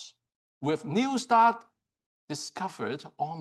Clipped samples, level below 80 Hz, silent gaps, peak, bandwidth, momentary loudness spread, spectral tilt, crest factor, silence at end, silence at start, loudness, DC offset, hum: under 0.1%; -80 dBFS; 0.35-0.61 s, 2.06-2.28 s; -12 dBFS; 12 kHz; 17 LU; -5 dB/octave; 18 dB; 0 s; 0 s; -28 LUFS; under 0.1%; none